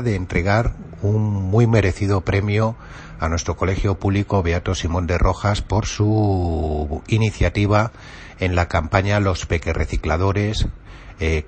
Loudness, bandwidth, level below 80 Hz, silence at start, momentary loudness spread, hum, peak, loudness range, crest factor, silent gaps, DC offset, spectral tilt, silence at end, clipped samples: -20 LUFS; 8.6 kHz; -30 dBFS; 0 s; 8 LU; none; 0 dBFS; 1 LU; 18 dB; none; under 0.1%; -6.5 dB/octave; 0 s; under 0.1%